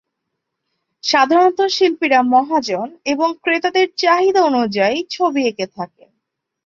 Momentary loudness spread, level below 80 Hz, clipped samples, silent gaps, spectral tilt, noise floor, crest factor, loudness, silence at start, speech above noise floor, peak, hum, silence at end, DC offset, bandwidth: 10 LU; -64 dBFS; under 0.1%; none; -3.5 dB/octave; -77 dBFS; 16 dB; -16 LUFS; 1.05 s; 61 dB; -2 dBFS; none; 0.8 s; under 0.1%; 7.4 kHz